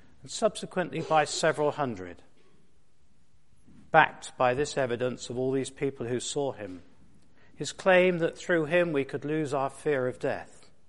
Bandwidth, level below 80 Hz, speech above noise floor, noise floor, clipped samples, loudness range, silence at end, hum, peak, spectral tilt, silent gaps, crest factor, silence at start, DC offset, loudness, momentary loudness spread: 11.5 kHz; -62 dBFS; 40 dB; -68 dBFS; under 0.1%; 4 LU; 0.45 s; none; -4 dBFS; -4.5 dB/octave; none; 26 dB; 0.25 s; 0.3%; -28 LUFS; 14 LU